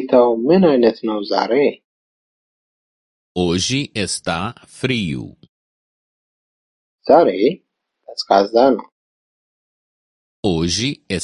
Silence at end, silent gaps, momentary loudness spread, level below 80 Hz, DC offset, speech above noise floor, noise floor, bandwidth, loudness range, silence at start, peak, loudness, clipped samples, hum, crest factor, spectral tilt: 0 s; 1.84-3.35 s, 5.49-6.98 s, 8.92-10.43 s; 15 LU; -46 dBFS; under 0.1%; 26 dB; -42 dBFS; 11.5 kHz; 5 LU; 0 s; 0 dBFS; -17 LUFS; under 0.1%; none; 18 dB; -5 dB/octave